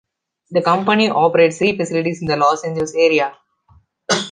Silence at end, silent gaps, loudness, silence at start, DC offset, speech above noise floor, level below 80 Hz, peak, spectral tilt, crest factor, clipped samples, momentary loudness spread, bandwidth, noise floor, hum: 0 s; none; -16 LUFS; 0.5 s; under 0.1%; 38 dB; -56 dBFS; -2 dBFS; -4.5 dB/octave; 16 dB; under 0.1%; 7 LU; 9.8 kHz; -54 dBFS; none